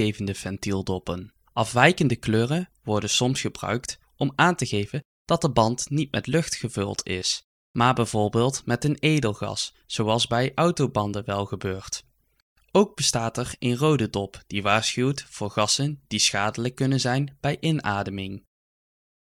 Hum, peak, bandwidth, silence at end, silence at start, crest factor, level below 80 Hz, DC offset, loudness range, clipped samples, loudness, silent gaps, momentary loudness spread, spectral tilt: none; -2 dBFS; 15.5 kHz; 0.8 s; 0 s; 24 dB; -52 dBFS; under 0.1%; 2 LU; under 0.1%; -24 LUFS; 5.05-5.25 s, 7.44-7.74 s, 12.42-12.56 s; 9 LU; -4.5 dB/octave